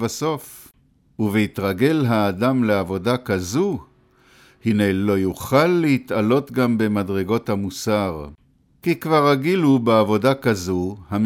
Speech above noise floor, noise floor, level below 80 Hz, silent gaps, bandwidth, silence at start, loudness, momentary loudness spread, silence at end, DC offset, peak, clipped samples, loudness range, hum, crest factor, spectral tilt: 38 dB; -57 dBFS; -52 dBFS; none; 17 kHz; 0 s; -20 LUFS; 9 LU; 0 s; under 0.1%; -4 dBFS; under 0.1%; 2 LU; none; 16 dB; -6.5 dB/octave